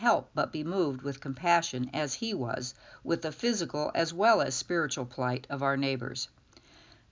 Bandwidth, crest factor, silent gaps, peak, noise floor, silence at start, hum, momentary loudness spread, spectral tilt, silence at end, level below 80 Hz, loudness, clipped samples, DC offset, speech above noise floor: 7.6 kHz; 20 dB; none; -12 dBFS; -58 dBFS; 0 s; none; 10 LU; -4 dB/octave; 0.85 s; -66 dBFS; -31 LUFS; under 0.1%; under 0.1%; 28 dB